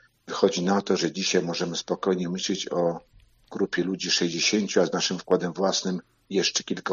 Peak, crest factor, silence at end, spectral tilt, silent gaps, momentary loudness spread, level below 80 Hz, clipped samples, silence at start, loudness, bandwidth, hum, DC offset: -6 dBFS; 20 dB; 0 s; -3.5 dB/octave; none; 7 LU; -66 dBFS; under 0.1%; 0.25 s; -25 LUFS; 7.6 kHz; none; under 0.1%